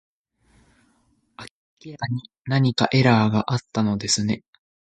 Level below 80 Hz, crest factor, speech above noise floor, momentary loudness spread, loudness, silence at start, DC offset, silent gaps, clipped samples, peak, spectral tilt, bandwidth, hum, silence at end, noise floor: -56 dBFS; 22 dB; 44 dB; 25 LU; -22 LUFS; 1.4 s; under 0.1%; 1.51-1.77 s, 2.41-2.45 s; under 0.1%; -2 dBFS; -5 dB/octave; 9.4 kHz; none; 0.5 s; -65 dBFS